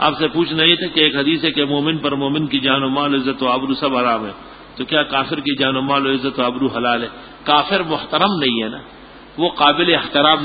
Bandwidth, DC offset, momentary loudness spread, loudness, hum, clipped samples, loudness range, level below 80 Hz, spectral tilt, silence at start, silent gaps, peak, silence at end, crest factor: 5 kHz; under 0.1%; 9 LU; -17 LUFS; none; under 0.1%; 3 LU; -50 dBFS; -8.5 dB/octave; 0 s; none; 0 dBFS; 0 s; 18 dB